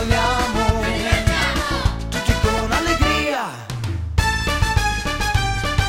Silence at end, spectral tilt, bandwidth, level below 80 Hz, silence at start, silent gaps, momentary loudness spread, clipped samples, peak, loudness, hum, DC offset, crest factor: 0 s; -4.5 dB/octave; 16 kHz; -24 dBFS; 0 s; none; 5 LU; under 0.1%; -2 dBFS; -20 LUFS; none; under 0.1%; 18 dB